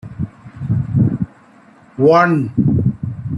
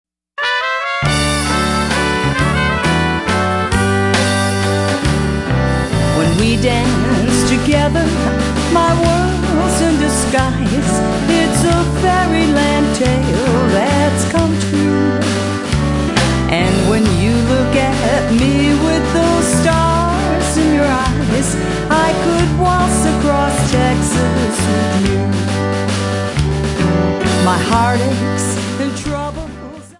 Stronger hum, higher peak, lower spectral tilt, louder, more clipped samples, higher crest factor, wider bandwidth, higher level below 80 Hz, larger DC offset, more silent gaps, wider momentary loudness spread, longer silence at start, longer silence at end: neither; about the same, -2 dBFS vs -2 dBFS; first, -9.5 dB/octave vs -5 dB/octave; about the same, -16 LUFS vs -14 LUFS; neither; about the same, 16 dB vs 12 dB; second, 6.6 kHz vs 11.5 kHz; second, -42 dBFS vs -26 dBFS; neither; neither; first, 16 LU vs 4 LU; second, 0.05 s vs 0.4 s; about the same, 0 s vs 0.1 s